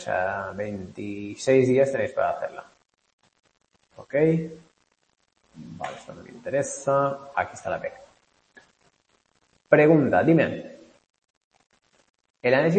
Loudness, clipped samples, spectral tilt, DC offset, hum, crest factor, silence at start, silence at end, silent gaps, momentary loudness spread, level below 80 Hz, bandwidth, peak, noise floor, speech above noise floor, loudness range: -24 LUFS; under 0.1%; -6.5 dB/octave; under 0.1%; none; 22 dB; 0 s; 0 s; 3.13-3.18 s, 11.30-11.51 s, 12.10-12.14 s, 12.30-12.34 s; 18 LU; -64 dBFS; 8.8 kHz; -4 dBFS; -71 dBFS; 47 dB; 7 LU